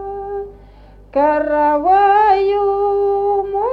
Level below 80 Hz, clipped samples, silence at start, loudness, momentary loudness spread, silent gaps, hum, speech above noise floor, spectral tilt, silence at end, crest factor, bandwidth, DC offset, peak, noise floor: -42 dBFS; under 0.1%; 0 s; -15 LUFS; 14 LU; none; none; 28 dB; -7 dB/octave; 0 s; 12 dB; 5.4 kHz; under 0.1%; -2 dBFS; -42 dBFS